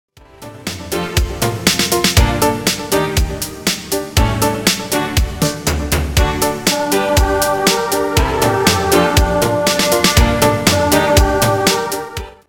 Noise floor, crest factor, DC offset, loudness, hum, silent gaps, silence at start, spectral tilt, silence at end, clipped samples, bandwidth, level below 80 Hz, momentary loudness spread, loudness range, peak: -36 dBFS; 14 dB; under 0.1%; -15 LUFS; none; none; 0.4 s; -4 dB/octave; 0.2 s; under 0.1%; 19.5 kHz; -24 dBFS; 7 LU; 4 LU; 0 dBFS